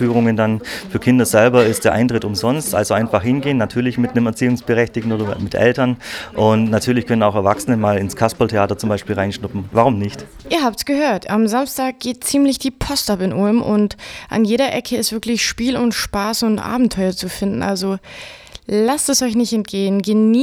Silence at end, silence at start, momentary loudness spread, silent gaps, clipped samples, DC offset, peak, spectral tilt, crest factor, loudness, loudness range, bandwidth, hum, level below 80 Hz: 0 s; 0 s; 7 LU; none; under 0.1%; under 0.1%; 0 dBFS; -5 dB/octave; 16 dB; -17 LUFS; 3 LU; 17 kHz; none; -44 dBFS